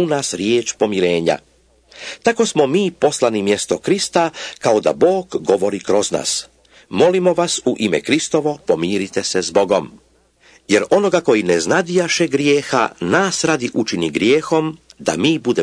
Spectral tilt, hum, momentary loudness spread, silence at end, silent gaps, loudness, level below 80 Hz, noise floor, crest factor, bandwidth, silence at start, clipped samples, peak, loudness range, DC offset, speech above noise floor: -4 dB/octave; none; 5 LU; 0 s; none; -17 LUFS; -56 dBFS; -53 dBFS; 16 dB; 11 kHz; 0 s; under 0.1%; -2 dBFS; 2 LU; under 0.1%; 36 dB